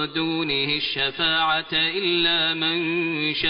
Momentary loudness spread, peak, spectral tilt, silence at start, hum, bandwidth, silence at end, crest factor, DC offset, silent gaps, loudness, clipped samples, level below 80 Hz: 4 LU; -8 dBFS; -1 dB/octave; 0 s; none; 5.4 kHz; 0 s; 14 dB; under 0.1%; none; -21 LUFS; under 0.1%; -54 dBFS